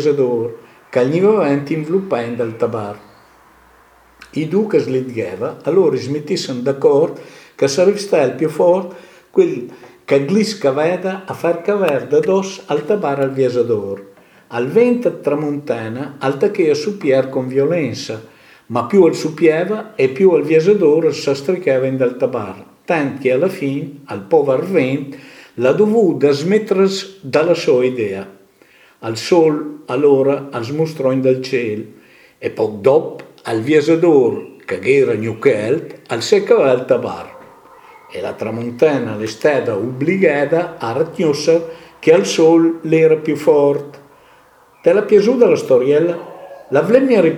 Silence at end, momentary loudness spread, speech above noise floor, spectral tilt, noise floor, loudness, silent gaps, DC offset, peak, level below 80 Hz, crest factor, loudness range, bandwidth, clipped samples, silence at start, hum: 0 s; 13 LU; 34 dB; -6 dB/octave; -49 dBFS; -16 LUFS; none; under 0.1%; 0 dBFS; -64 dBFS; 16 dB; 4 LU; 13.5 kHz; under 0.1%; 0 s; none